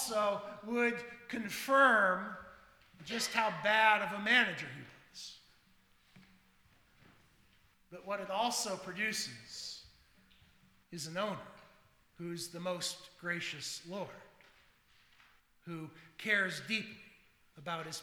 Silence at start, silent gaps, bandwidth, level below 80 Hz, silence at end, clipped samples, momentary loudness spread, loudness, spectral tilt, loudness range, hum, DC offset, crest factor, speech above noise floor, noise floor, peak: 0 s; none; over 20 kHz; -76 dBFS; 0 s; under 0.1%; 22 LU; -34 LUFS; -2.5 dB/octave; 13 LU; none; under 0.1%; 24 dB; 33 dB; -68 dBFS; -14 dBFS